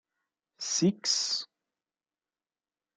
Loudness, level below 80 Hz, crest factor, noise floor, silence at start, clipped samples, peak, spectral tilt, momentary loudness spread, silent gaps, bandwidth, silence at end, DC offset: -28 LUFS; -76 dBFS; 20 dB; under -90 dBFS; 0.6 s; under 0.1%; -14 dBFS; -3 dB/octave; 12 LU; none; 11 kHz; 1.5 s; under 0.1%